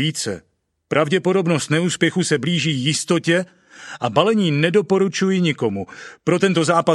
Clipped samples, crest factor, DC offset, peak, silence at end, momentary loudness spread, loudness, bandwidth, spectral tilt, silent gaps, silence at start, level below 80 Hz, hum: under 0.1%; 18 dB; under 0.1%; 0 dBFS; 0 s; 10 LU; -19 LUFS; 12 kHz; -5 dB/octave; none; 0 s; -62 dBFS; none